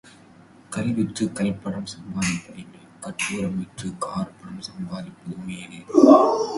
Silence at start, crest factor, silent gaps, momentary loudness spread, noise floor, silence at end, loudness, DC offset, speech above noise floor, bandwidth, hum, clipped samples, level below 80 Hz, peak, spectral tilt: 0.7 s; 22 dB; none; 21 LU; -50 dBFS; 0 s; -22 LUFS; under 0.1%; 27 dB; 11.5 kHz; none; under 0.1%; -56 dBFS; 0 dBFS; -5.5 dB/octave